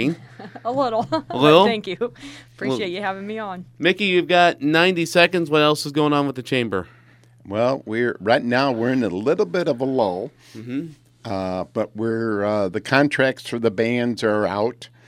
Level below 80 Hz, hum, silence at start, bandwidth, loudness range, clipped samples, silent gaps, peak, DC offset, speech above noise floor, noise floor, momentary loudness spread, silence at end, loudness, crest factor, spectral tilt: -62 dBFS; none; 0 s; 16 kHz; 6 LU; under 0.1%; none; 0 dBFS; under 0.1%; 31 dB; -51 dBFS; 13 LU; 0.2 s; -20 LUFS; 20 dB; -5.5 dB/octave